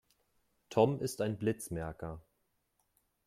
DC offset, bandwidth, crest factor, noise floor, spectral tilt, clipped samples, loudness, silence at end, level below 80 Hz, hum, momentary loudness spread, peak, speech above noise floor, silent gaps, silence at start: under 0.1%; 15.5 kHz; 24 dB; -79 dBFS; -6 dB/octave; under 0.1%; -34 LUFS; 1.05 s; -62 dBFS; none; 15 LU; -14 dBFS; 46 dB; none; 0.7 s